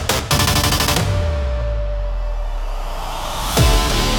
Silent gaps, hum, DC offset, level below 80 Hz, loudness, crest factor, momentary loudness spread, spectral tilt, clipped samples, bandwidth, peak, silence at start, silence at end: none; none; under 0.1%; -22 dBFS; -19 LUFS; 16 dB; 12 LU; -3.5 dB/octave; under 0.1%; 19 kHz; -2 dBFS; 0 s; 0 s